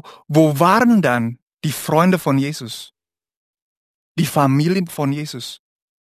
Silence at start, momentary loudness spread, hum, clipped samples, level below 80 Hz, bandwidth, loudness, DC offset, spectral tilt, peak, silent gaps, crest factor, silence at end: 0.05 s; 16 LU; none; under 0.1%; -60 dBFS; 15 kHz; -17 LUFS; under 0.1%; -6 dB/octave; 0 dBFS; 1.42-1.47 s, 3.37-3.54 s, 3.62-4.15 s; 18 dB; 0.45 s